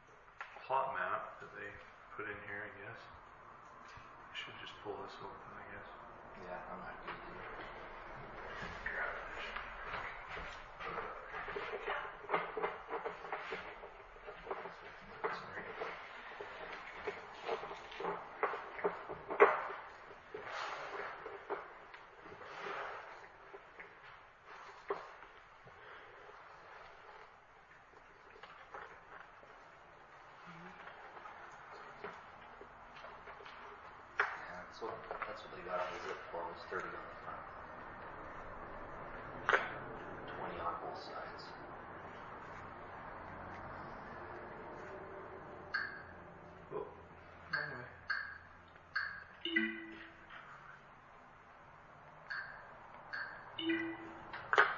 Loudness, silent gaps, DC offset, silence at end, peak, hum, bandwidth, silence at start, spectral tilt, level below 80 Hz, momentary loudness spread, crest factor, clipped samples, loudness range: -43 LUFS; none; under 0.1%; 0 s; -12 dBFS; none; 7 kHz; 0 s; -1.5 dB/octave; -66 dBFS; 16 LU; 32 dB; under 0.1%; 14 LU